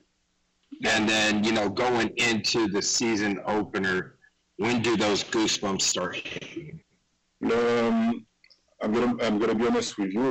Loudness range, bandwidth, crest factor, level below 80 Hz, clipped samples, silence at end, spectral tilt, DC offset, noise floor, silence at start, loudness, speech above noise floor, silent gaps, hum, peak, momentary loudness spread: 4 LU; 15.5 kHz; 10 dB; -58 dBFS; under 0.1%; 0 s; -3.5 dB/octave; under 0.1%; -72 dBFS; 0.7 s; -25 LUFS; 47 dB; none; none; -16 dBFS; 11 LU